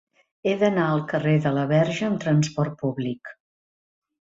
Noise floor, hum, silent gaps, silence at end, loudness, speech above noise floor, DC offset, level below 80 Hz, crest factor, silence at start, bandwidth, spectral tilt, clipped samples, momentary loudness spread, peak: under -90 dBFS; none; none; 0.9 s; -23 LUFS; over 68 dB; under 0.1%; -62 dBFS; 16 dB; 0.45 s; 7.8 kHz; -7 dB/octave; under 0.1%; 9 LU; -8 dBFS